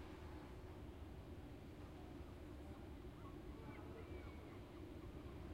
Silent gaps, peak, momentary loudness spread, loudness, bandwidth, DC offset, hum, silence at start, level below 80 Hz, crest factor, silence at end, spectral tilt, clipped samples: none; -40 dBFS; 2 LU; -56 LUFS; 16 kHz; under 0.1%; none; 0 s; -60 dBFS; 14 dB; 0 s; -7 dB/octave; under 0.1%